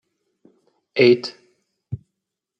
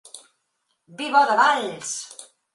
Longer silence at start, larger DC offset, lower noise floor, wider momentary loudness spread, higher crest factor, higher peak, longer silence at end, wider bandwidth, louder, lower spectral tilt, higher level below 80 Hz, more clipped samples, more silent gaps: first, 0.95 s vs 0.15 s; neither; first, -81 dBFS vs -74 dBFS; about the same, 20 LU vs 19 LU; about the same, 20 dB vs 20 dB; about the same, -4 dBFS vs -4 dBFS; first, 0.65 s vs 0.3 s; second, 7.4 kHz vs 11.5 kHz; first, -18 LUFS vs -21 LUFS; first, -6.5 dB/octave vs -1.5 dB/octave; first, -62 dBFS vs -78 dBFS; neither; neither